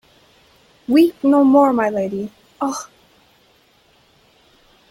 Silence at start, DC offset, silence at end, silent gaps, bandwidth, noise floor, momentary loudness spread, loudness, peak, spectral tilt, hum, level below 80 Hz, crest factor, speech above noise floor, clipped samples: 0.9 s; under 0.1%; 2.05 s; none; 15.5 kHz; -56 dBFS; 19 LU; -16 LUFS; -4 dBFS; -5.5 dB/octave; none; -62 dBFS; 16 dB; 41 dB; under 0.1%